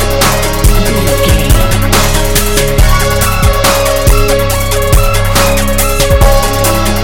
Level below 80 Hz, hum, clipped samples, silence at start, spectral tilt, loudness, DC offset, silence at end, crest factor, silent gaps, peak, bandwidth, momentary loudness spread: -12 dBFS; none; 0.8%; 0 s; -4 dB/octave; -9 LUFS; 4%; 0 s; 8 dB; none; 0 dBFS; 17.5 kHz; 2 LU